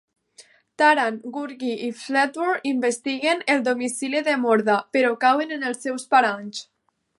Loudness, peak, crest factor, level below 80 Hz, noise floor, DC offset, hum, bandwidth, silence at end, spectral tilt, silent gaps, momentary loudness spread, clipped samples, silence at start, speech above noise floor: -22 LUFS; -4 dBFS; 20 dB; -78 dBFS; -53 dBFS; under 0.1%; none; 11.5 kHz; 0.55 s; -3 dB/octave; none; 10 LU; under 0.1%; 0.4 s; 31 dB